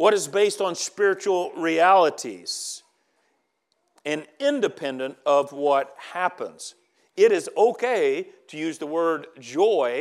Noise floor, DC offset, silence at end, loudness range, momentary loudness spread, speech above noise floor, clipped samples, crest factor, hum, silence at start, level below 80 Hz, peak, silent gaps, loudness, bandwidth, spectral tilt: -73 dBFS; under 0.1%; 0 s; 4 LU; 14 LU; 50 dB; under 0.1%; 18 dB; none; 0 s; under -90 dBFS; -4 dBFS; none; -23 LUFS; 13.5 kHz; -3 dB/octave